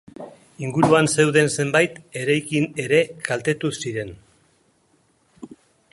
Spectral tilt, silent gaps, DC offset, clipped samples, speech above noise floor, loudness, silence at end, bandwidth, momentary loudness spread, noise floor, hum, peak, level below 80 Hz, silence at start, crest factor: -4.5 dB/octave; none; under 0.1%; under 0.1%; 42 dB; -20 LUFS; 0.45 s; 11.5 kHz; 16 LU; -62 dBFS; none; -2 dBFS; -58 dBFS; 0.2 s; 20 dB